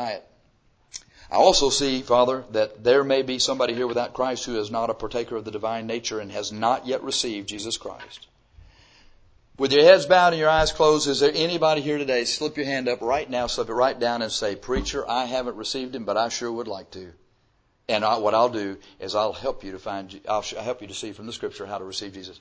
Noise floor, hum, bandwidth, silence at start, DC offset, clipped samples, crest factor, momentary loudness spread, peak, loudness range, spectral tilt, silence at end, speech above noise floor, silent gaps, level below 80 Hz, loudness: -65 dBFS; none; 8 kHz; 0 s; under 0.1%; under 0.1%; 22 dB; 15 LU; -2 dBFS; 9 LU; -3 dB/octave; 0.05 s; 42 dB; none; -48 dBFS; -23 LUFS